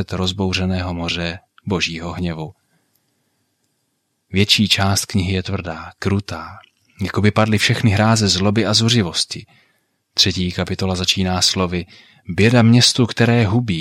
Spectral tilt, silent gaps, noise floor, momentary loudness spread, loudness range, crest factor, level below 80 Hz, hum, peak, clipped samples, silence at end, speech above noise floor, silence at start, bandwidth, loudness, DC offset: -4.5 dB/octave; none; -70 dBFS; 14 LU; 8 LU; 18 dB; -46 dBFS; none; 0 dBFS; under 0.1%; 0 s; 52 dB; 0 s; 16 kHz; -17 LUFS; under 0.1%